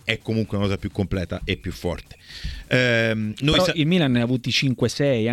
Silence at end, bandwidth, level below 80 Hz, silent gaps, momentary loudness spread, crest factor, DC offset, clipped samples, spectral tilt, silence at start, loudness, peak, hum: 0 s; 15 kHz; -40 dBFS; none; 12 LU; 20 dB; under 0.1%; under 0.1%; -5.5 dB/octave; 0.05 s; -22 LUFS; -4 dBFS; none